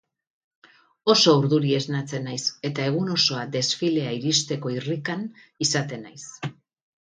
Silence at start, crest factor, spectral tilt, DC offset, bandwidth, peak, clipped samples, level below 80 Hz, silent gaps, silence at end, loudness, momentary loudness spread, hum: 1.05 s; 22 dB; -4 dB/octave; under 0.1%; 9.6 kHz; -4 dBFS; under 0.1%; -68 dBFS; none; 0.6 s; -23 LUFS; 17 LU; none